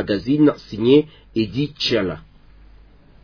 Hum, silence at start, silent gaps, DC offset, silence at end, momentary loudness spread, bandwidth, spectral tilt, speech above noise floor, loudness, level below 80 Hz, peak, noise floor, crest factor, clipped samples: none; 0 s; none; under 0.1%; 1.05 s; 11 LU; 5.4 kHz; -7 dB/octave; 28 dB; -19 LUFS; -48 dBFS; -2 dBFS; -47 dBFS; 18 dB; under 0.1%